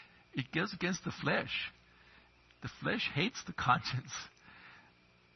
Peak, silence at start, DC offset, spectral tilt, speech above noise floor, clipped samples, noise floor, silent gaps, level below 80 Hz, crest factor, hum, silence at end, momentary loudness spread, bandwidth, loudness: -14 dBFS; 0 s; under 0.1%; -3 dB/octave; 30 dB; under 0.1%; -65 dBFS; none; -66 dBFS; 24 dB; none; 0.55 s; 20 LU; 6.2 kHz; -36 LUFS